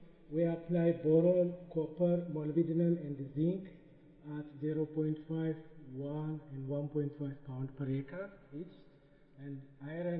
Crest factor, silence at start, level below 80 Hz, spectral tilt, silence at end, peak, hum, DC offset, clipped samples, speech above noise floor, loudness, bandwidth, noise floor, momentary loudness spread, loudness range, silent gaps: 18 dB; 0 s; -66 dBFS; -10 dB/octave; 0 s; -18 dBFS; none; under 0.1%; under 0.1%; 27 dB; -36 LUFS; 4 kHz; -62 dBFS; 17 LU; 9 LU; none